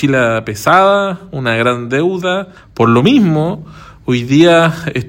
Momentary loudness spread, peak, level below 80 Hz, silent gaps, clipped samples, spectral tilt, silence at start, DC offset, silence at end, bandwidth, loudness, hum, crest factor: 11 LU; 0 dBFS; -46 dBFS; none; 0.3%; -6 dB/octave; 0 s; under 0.1%; 0 s; 17 kHz; -12 LUFS; none; 12 dB